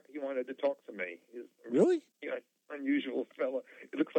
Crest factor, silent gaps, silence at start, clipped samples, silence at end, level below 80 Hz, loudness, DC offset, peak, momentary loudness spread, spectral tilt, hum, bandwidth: 20 dB; none; 0.1 s; under 0.1%; 0 s; under -90 dBFS; -35 LUFS; under 0.1%; -14 dBFS; 16 LU; -6.5 dB/octave; none; 9 kHz